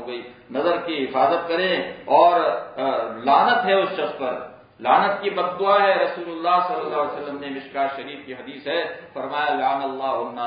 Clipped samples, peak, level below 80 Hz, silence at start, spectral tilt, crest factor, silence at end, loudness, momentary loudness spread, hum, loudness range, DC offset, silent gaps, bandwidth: under 0.1%; -4 dBFS; -68 dBFS; 0 s; -9 dB/octave; 18 dB; 0 s; -21 LUFS; 15 LU; none; 6 LU; under 0.1%; none; 5.2 kHz